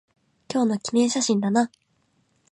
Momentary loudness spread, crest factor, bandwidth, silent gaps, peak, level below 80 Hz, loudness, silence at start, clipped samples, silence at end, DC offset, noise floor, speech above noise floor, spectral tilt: 6 LU; 16 dB; 11 kHz; none; -10 dBFS; -72 dBFS; -23 LUFS; 0.5 s; under 0.1%; 0.85 s; under 0.1%; -67 dBFS; 46 dB; -4.5 dB/octave